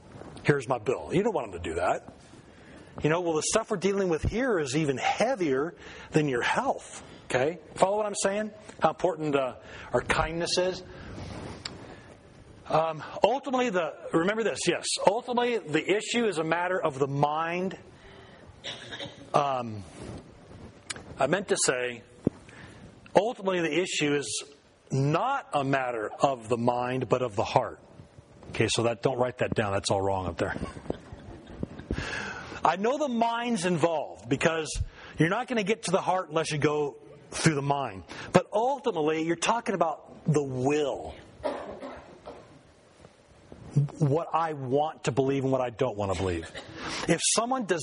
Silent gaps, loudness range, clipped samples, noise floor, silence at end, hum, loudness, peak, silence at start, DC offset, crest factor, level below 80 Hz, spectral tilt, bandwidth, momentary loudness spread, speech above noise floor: none; 4 LU; under 0.1%; -55 dBFS; 0 s; none; -28 LUFS; -2 dBFS; 0.05 s; under 0.1%; 28 dB; -52 dBFS; -4.5 dB/octave; 10.5 kHz; 14 LU; 28 dB